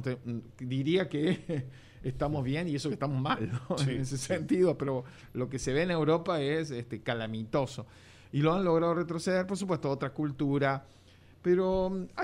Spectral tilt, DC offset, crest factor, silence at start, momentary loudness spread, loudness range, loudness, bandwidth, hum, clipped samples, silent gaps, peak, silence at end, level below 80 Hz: -6.5 dB/octave; under 0.1%; 18 dB; 0 s; 10 LU; 2 LU; -31 LUFS; 12 kHz; none; under 0.1%; none; -14 dBFS; 0 s; -56 dBFS